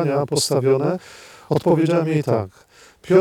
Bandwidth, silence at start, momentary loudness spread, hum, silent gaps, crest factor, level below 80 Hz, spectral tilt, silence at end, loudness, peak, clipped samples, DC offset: 17.5 kHz; 0 s; 10 LU; none; none; 18 dB; -60 dBFS; -6 dB/octave; 0 s; -20 LUFS; -2 dBFS; under 0.1%; under 0.1%